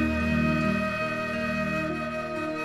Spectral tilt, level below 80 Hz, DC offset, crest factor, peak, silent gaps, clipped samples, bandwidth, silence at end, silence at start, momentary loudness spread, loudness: -6.5 dB/octave; -42 dBFS; 0.1%; 14 dB; -14 dBFS; none; under 0.1%; 14.5 kHz; 0 s; 0 s; 6 LU; -27 LUFS